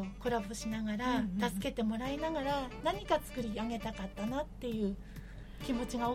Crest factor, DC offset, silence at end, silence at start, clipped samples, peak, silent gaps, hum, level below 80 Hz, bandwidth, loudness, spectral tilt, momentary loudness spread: 18 dB; under 0.1%; 0 s; 0 s; under 0.1%; -18 dBFS; none; none; -50 dBFS; 16.5 kHz; -36 LUFS; -5.5 dB/octave; 7 LU